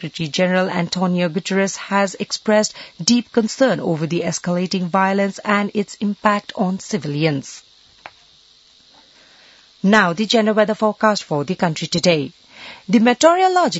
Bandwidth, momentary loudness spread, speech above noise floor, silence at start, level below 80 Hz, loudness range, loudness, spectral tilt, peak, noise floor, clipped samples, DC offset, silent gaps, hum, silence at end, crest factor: 8 kHz; 9 LU; 33 dB; 0 s; -62 dBFS; 6 LU; -18 LUFS; -4.5 dB/octave; 0 dBFS; -51 dBFS; under 0.1%; under 0.1%; none; none; 0 s; 18 dB